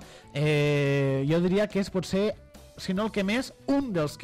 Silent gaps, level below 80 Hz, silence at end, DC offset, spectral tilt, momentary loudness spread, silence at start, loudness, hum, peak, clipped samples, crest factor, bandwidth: none; -52 dBFS; 0 s; under 0.1%; -6.5 dB/octave; 7 LU; 0 s; -27 LUFS; none; -14 dBFS; under 0.1%; 12 dB; 15.5 kHz